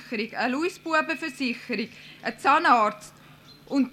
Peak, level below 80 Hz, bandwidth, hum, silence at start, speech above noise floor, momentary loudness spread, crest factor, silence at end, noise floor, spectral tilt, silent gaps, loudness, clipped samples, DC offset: -8 dBFS; -68 dBFS; 15 kHz; none; 0 s; 25 dB; 14 LU; 18 dB; 0 s; -50 dBFS; -4 dB/octave; none; -25 LUFS; under 0.1%; under 0.1%